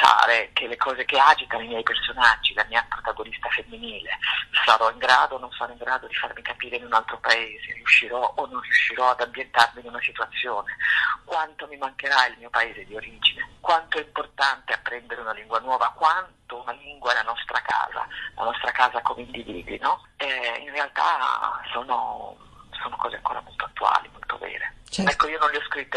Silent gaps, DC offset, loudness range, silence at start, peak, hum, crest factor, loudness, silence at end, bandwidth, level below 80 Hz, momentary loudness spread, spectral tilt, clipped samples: none; under 0.1%; 5 LU; 0 s; 0 dBFS; none; 24 dB; -23 LUFS; 0 s; 12 kHz; -54 dBFS; 14 LU; -2 dB/octave; under 0.1%